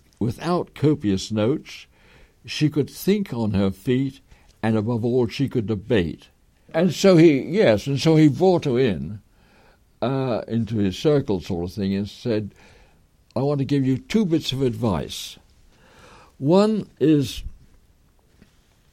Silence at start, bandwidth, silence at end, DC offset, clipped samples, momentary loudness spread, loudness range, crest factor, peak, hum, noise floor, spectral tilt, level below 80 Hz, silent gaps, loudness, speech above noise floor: 0.2 s; 16 kHz; 1.4 s; under 0.1%; under 0.1%; 13 LU; 6 LU; 18 dB; -4 dBFS; none; -57 dBFS; -7 dB/octave; -48 dBFS; none; -22 LUFS; 37 dB